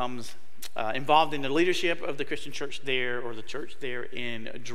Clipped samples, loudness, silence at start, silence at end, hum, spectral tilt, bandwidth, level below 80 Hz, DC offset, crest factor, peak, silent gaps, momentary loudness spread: under 0.1%; -29 LUFS; 0 s; 0 s; none; -4 dB/octave; 16 kHz; -64 dBFS; 4%; 22 dB; -8 dBFS; none; 16 LU